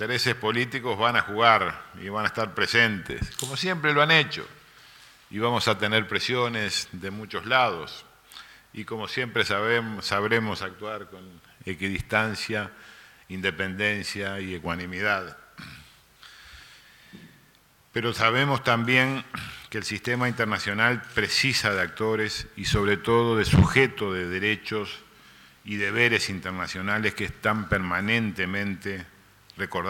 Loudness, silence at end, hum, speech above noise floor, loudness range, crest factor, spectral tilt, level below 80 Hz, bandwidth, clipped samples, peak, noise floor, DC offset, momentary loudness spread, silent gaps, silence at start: -25 LUFS; 0 s; none; 33 dB; 6 LU; 22 dB; -4.5 dB/octave; -48 dBFS; 17.5 kHz; under 0.1%; -4 dBFS; -59 dBFS; under 0.1%; 16 LU; none; 0 s